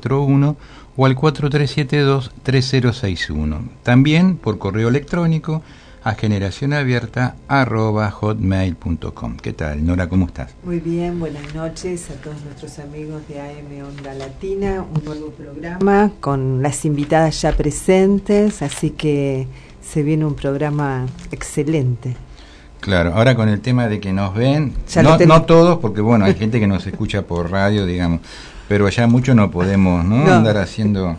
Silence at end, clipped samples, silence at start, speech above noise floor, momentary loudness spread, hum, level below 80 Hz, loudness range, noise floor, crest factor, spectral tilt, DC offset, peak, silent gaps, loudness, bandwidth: 0 s; under 0.1%; 0 s; 23 dB; 17 LU; none; -34 dBFS; 11 LU; -39 dBFS; 16 dB; -7 dB/octave; under 0.1%; -2 dBFS; none; -17 LUFS; 11 kHz